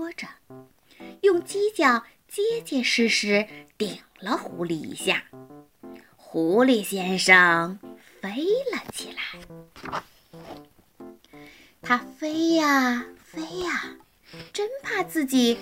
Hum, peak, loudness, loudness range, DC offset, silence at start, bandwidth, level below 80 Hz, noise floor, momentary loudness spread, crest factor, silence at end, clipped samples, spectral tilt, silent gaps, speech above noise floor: none; 0 dBFS; -24 LUFS; 10 LU; under 0.1%; 0 s; 16 kHz; -64 dBFS; -49 dBFS; 17 LU; 24 dB; 0 s; under 0.1%; -3.5 dB/octave; none; 25 dB